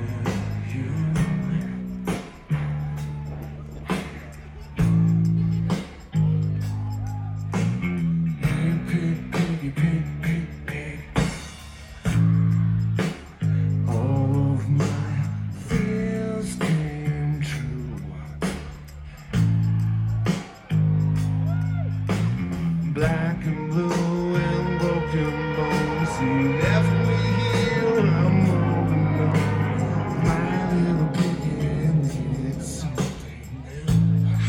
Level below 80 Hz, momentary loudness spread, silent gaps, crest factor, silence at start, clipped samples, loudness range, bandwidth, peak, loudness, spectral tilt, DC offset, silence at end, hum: -40 dBFS; 11 LU; none; 16 dB; 0 s; under 0.1%; 6 LU; 12.5 kHz; -8 dBFS; -24 LUFS; -7.5 dB/octave; under 0.1%; 0 s; none